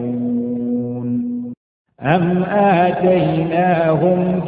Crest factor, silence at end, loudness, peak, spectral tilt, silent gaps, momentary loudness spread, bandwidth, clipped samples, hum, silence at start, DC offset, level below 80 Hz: 16 dB; 0 s; -17 LUFS; 0 dBFS; -11.5 dB/octave; 1.57-1.85 s; 8 LU; 4.8 kHz; under 0.1%; none; 0 s; under 0.1%; -50 dBFS